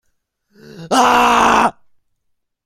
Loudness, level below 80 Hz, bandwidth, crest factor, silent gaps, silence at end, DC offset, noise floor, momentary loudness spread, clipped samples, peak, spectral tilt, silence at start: -13 LUFS; -46 dBFS; 16.5 kHz; 16 dB; none; 0.95 s; under 0.1%; -71 dBFS; 7 LU; under 0.1%; 0 dBFS; -2.5 dB/octave; 0.75 s